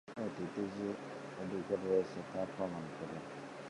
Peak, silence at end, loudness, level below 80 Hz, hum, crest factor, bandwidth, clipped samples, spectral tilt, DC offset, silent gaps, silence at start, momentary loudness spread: -22 dBFS; 0 s; -40 LUFS; -72 dBFS; none; 18 dB; 11.5 kHz; under 0.1%; -6.5 dB/octave; under 0.1%; none; 0.05 s; 10 LU